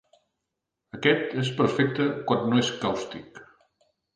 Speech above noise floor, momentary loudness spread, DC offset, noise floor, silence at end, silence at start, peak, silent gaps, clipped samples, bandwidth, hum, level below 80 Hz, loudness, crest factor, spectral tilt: 58 dB; 12 LU; under 0.1%; -84 dBFS; 0.7 s; 0.95 s; -8 dBFS; none; under 0.1%; 9.8 kHz; none; -64 dBFS; -25 LUFS; 20 dB; -5.5 dB/octave